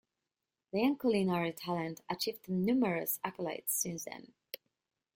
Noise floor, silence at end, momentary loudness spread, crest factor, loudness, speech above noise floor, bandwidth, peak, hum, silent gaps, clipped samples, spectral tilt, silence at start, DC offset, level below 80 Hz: -90 dBFS; 0.6 s; 17 LU; 16 dB; -34 LUFS; 56 dB; 17 kHz; -18 dBFS; none; none; under 0.1%; -4.5 dB/octave; 0.75 s; under 0.1%; -74 dBFS